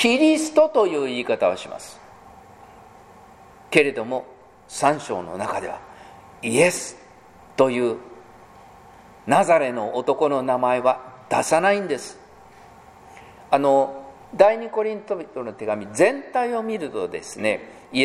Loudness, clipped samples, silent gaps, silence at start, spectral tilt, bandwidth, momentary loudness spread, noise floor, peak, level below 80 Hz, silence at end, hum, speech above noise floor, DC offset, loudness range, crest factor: -22 LUFS; under 0.1%; none; 0 s; -4 dB/octave; 15 kHz; 15 LU; -48 dBFS; 0 dBFS; -62 dBFS; 0 s; none; 27 dB; under 0.1%; 4 LU; 22 dB